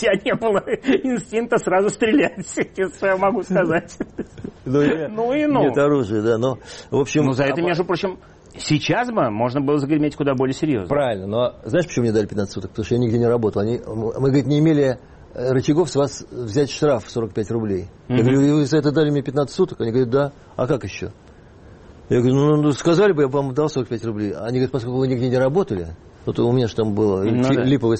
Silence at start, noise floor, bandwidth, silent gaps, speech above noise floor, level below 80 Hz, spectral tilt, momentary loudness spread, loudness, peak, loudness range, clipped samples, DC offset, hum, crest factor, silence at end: 0 s; -44 dBFS; 8.8 kHz; none; 25 dB; -48 dBFS; -6.5 dB/octave; 9 LU; -20 LUFS; -6 dBFS; 2 LU; under 0.1%; under 0.1%; none; 14 dB; 0 s